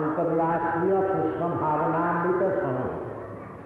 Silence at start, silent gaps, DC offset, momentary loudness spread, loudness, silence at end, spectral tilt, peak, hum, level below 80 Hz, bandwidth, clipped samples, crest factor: 0 s; none; under 0.1%; 10 LU; -25 LUFS; 0 s; -10 dB/octave; -14 dBFS; none; -56 dBFS; 4.1 kHz; under 0.1%; 12 dB